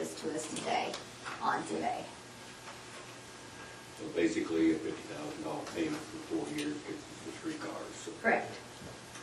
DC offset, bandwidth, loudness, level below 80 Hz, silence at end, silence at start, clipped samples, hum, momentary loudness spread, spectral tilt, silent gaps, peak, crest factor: under 0.1%; 12 kHz; -37 LUFS; -68 dBFS; 0 s; 0 s; under 0.1%; none; 16 LU; -4 dB/octave; none; -16 dBFS; 22 dB